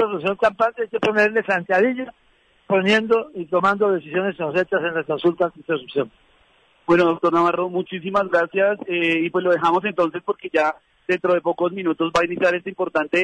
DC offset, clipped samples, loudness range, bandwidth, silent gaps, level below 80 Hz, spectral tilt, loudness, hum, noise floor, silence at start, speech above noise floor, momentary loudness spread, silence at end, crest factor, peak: under 0.1%; under 0.1%; 2 LU; 10 kHz; none; -60 dBFS; -6 dB/octave; -20 LUFS; none; -58 dBFS; 0 s; 38 dB; 7 LU; 0 s; 14 dB; -6 dBFS